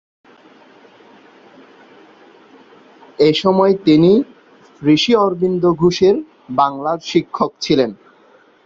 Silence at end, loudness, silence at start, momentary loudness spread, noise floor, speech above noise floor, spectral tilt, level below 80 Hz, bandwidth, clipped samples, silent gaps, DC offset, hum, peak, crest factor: 0.7 s; -15 LUFS; 3.2 s; 10 LU; -50 dBFS; 36 dB; -6 dB/octave; -54 dBFS; 7.6 kHz; under 0.1%; none; under 0.1%; none; -2 dBFS; 16 dB